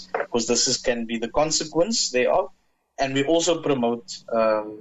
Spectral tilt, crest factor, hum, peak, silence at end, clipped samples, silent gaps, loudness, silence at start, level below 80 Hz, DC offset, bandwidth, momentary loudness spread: -2.5 dB/octave; 14 dB; none; -8 dBFS; 0 s; under 0.1%; none; -23 LUFS; 0 s; -52 dBFS; under 0.1%; 8.8 kHz; 7 LU